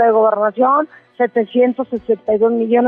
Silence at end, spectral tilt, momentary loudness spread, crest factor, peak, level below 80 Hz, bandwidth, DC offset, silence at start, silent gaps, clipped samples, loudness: 0 s; -9.5 dB/octave; 7 LU; 10 dB; -4 dBFS; -60 dBFS; 3.7 kHz; under 0.1%; 0 s; none; under 0.1%; -16 LUFS